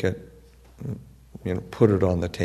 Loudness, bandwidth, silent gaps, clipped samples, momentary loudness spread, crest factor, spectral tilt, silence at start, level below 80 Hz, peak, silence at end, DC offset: -25 LUFS; 13.5 kHz; none; under 0.1%; 19 LU; 22 dB; -8 dB/octave; 0 s; -48 dBFS; -4 dBFS; 0 s; under 0.1%